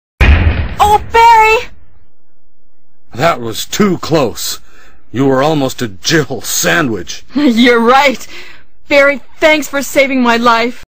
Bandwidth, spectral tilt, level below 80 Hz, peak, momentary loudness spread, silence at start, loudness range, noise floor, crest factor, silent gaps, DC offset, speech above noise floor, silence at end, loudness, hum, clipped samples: 16 kHz; -4.5 dB/octave; -22 dBFS; 0 dBFS; 13 LU; 0.2 s; 5 LU; -52 dBFS; 12 dB; none; 6%; 42 dB; 0 s; -11 LUFS; none; under 0.1%